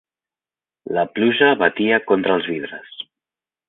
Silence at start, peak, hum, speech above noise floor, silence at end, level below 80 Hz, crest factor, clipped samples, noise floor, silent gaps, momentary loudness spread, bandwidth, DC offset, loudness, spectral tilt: 0.85 s; -2 dBFS; none; over 72 dB; 0.65 s; -64 dBFS; 18 dB; under 0.1%; under -90 dBFS; none; 19 LU; 4.1 kHz; under 0.1%; -18 LUFS; -9.5 dB/octave